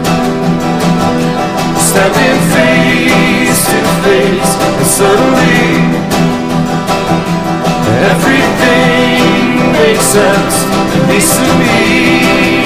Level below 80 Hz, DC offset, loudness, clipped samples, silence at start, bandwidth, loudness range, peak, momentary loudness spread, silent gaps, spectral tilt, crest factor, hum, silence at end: -32 dBFS; 2%; -9 LUFS; 0.2%; 0 s; 16.5 kHz; 2 LU; 0 dBFS; 5 LU; none; -4.5 dB/octave; 8 dB; none; 0 s